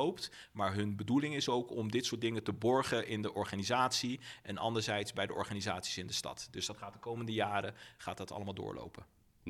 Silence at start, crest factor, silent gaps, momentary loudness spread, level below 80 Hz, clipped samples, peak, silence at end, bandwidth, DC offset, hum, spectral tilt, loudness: 0 s; 20 dB; none; 12 LU; -70 dBFS; under 0.1%; -18 dBFS; 0 s; 16 kHz; under 0.1%; none; -4 dB/octave; -37 LUFS